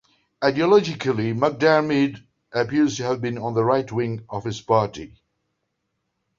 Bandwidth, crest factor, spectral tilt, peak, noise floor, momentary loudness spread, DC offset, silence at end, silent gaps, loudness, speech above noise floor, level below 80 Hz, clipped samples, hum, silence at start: 7.6 kHz; 20 dB; -6 dB/octave; -4 dBFS; -76 dBFS; 11 LU; under 0.1%; 1.3 s; none; -22 LUFS; 55 dB; -58 dBFS; under 0.1%; none; 0.4 s